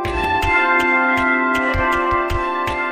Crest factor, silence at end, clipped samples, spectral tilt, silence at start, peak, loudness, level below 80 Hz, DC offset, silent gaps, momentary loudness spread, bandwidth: 14 dB; 0 s; under 0.1%; -5.5 dB/octave; 0 s; -4 dBFS; -17 LUFS; -32 dBFS; 0.4%; none; 6 LU; 15 kHz